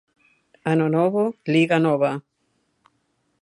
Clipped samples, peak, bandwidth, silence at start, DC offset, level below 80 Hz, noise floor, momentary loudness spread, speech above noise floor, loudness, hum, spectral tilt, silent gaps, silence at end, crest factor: under 0.1%; -6 dBFS; 11.5 kHz; 0.65 s; under 0.1%; -72 dBFS; -70 dBFS; 7 LU; 50 dB; -21 LUFS; none; -7.5 dB/octave; none; 1.2 s; 16 dB